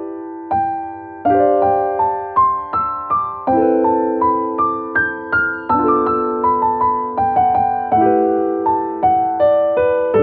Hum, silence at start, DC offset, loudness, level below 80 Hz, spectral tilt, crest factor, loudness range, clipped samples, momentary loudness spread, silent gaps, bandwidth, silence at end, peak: none; 0 s; under 0.1%; -16 LUFS; -48 dBFS; -10.5 dB/octave; 12 dB; 2 LU; under 0.1%; 5 LU; none; 4.5 kHz; 0 s; -4 dBFS